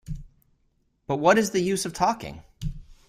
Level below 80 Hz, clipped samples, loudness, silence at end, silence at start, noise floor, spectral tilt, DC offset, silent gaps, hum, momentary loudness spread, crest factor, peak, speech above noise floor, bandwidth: -44 dBFS; under 0.1%; -24 LUFS; 0.15 s; 0.05 s; -69 dBFS; -4.5 dB/octave; under 0.1%; none; none; 20 LU; 20 dB; -6 dBFS; 45 dB; 16 kHz